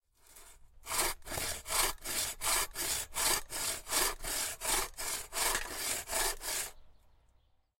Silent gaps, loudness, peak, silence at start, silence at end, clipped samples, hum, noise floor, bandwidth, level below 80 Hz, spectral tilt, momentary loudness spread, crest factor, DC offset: none; -33 LUFS; -16 dBFS; 0.3 s; 0.9 s; under 0.1%; none; -69 dBFS; 16.5 kHz; -50 dBFS; 0 dB/octave; 6 LU; 20 dB; under 0.1%